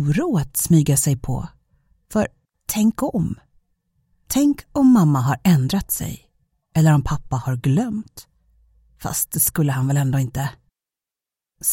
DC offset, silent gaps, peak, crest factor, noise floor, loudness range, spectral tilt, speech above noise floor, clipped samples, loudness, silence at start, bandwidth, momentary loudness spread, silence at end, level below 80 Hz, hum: under 0.1%; none; -4 dBFS; 16 dB; -89 dBFS; 5 LU; -6 dB/octave; 70 dB; under 0.1%; -20 LUFS; 0 s; 17 kHz; 13 LU; 0 s; -42 dBFS; none